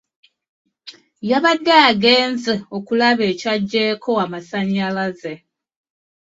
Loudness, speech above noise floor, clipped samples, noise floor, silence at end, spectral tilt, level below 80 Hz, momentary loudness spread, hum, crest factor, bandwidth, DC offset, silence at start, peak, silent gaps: -17 LUFS; 26 dB; under 0.1%; -43 dBFS; 0.85 s; -5 dB/octave; -62 dBFS; 13 LU; none; 18 dB; 7.8 kHz; under 0.1%; 0.85 s; 0 dBFS; none